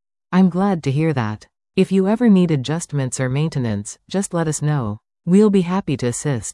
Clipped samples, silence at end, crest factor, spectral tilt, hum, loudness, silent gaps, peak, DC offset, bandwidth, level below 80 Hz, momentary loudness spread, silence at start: under 0.1%; 0 s; 14 dB; -6.5 dB/octave; none; -19 LUFS; none; -4 dBFS; under 0.1%; 12 kHz; -52 dBFS; 11 LU; 0.3 s